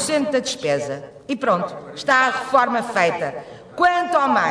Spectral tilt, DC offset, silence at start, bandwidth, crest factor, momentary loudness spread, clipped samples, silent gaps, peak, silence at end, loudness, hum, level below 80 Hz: -3.5 dB/octave; under 0.1%; 0 s; 11 kHz; 16 dB; 13 LU; under 0.1%; none; -4 dBFS; 0 s; -20 LUFS; none; -62 dBFS